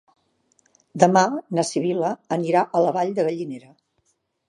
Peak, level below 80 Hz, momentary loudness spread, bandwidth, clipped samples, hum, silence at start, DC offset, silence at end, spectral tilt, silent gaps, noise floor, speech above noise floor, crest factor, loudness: -2 dBFS; -74 dBFS; 14 LU; 11.5 kHz; under 0.1%; none; 0.95 s; under 0.1%; 0.9 s; -5.5 dB/octave; none; -70 dBFS; 49 dB; 22 dB; -21 LUFS